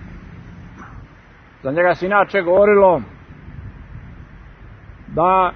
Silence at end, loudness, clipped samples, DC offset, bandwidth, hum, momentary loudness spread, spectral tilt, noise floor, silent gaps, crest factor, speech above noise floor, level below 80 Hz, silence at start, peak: 0 s; -16 LUFS; under 0.1%; under 0.1%; 6.4 kHz; none; 26 LU; -8 dB/octave; -45 dBFS; none; 18 dB; 31 dB; -42 dBFS; 0 s; -2 dBFS